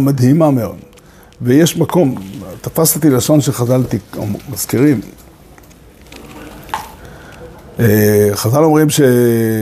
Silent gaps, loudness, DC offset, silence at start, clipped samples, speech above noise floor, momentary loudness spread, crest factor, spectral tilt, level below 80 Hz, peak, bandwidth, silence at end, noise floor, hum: none; -13 LUFS; under 0.1%; 0 s; under 0.1%; 29 dB; 19 LU; 14 dB; -6 dB/octave; -44 dBFS; 0 dBFS; 15.5 kHz; 0 s; -41 dBFS; none